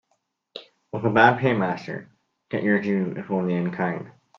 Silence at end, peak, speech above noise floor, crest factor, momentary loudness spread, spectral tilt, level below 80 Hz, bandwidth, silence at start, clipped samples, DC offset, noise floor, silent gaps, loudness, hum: 0.3 s; 0 dBFS; 50 dB; 24 dB; 22 LU; -8 dB/octave; -66 dBFS; 7 kHz; 0.55 s; under 0.1%; under 0.1%; -73 dBFS; none; -23 LUFS; none